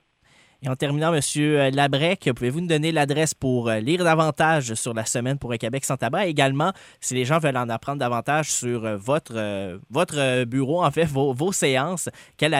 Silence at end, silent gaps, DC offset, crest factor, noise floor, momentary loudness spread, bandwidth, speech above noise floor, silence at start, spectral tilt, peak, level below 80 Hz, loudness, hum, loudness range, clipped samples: 0 s; none; under 0.1%; 20 dB; -58 dBFS; 7 LU; 16 kHz; 36 dB; 0.6 s; -4.5 dB/octave; -4 dBFS; -58 dBFS; -23 LUFS; none; 3 LU; under 0.1%